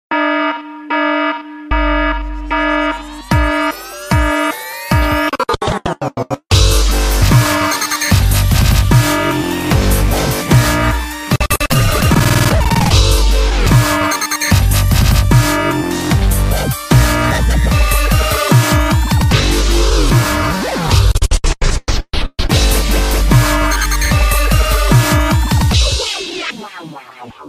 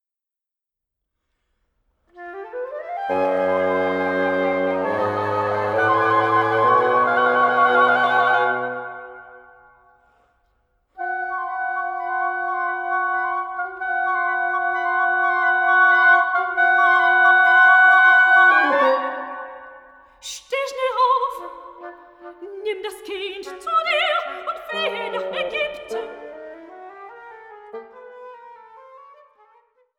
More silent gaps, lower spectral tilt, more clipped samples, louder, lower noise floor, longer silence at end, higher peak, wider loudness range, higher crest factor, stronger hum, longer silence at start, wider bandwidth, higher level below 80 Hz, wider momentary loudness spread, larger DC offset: neither; about the same, -4.5 dB/octave vs -4 dB/octave; neither; first, -13 LUFS vs -18 LUFS; second, -34 dBFS vs -88 dBFS; second, 0 s vs 1 s; first, 0 dBFS vs -4 dBFS; second, 4 LU vs 15 LU; second, 12 dB vs 18 dB; neither; second, 0.1 s vs 2.15 s; first, 15.5 kHz vs 13 kHz; first, -16 dBFS vs -66 dBFS; second, 8 LU vs 24 LU; neither